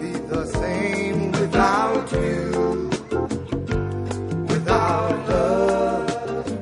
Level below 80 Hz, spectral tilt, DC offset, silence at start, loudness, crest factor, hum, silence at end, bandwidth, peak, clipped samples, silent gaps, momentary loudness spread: -38 dBFS; -6.5 dB/octave; under 0.1%; 0 s; -22 LUFS; 18 dB; none; 0 s; 10.5 kHz; -4 dBFS; under 0.1%; none; 8 LU